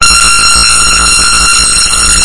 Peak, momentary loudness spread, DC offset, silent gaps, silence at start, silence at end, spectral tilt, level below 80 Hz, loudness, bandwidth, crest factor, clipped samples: 0 dBFS; 2 LU; under 0.1%; none; 0 s; 0 s; 0.5 dB/octave; -20 dBFS; -3 LUFS; 12 kHz; 6 dB; 5%